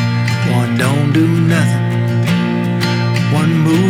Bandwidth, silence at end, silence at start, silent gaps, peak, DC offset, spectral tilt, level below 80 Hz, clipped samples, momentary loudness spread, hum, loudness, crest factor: 15 kHz; 0 s; 0 s; none; -2 dBFS; under 0.1%; -6.5 dB/octave; -54 dBFS; under 0.1%; 3 LU; none; -14 LUFS; 10 dB